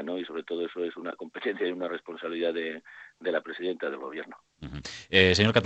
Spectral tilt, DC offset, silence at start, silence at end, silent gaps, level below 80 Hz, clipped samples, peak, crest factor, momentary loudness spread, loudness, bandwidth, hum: -5 dB/octave; under 0.1%; 0 s; 0 s; none; -60 dBFS; under 0.1%; -2 dBFS; 26 dB; 19 LU; -29 LUFS; 8.6 kHz; none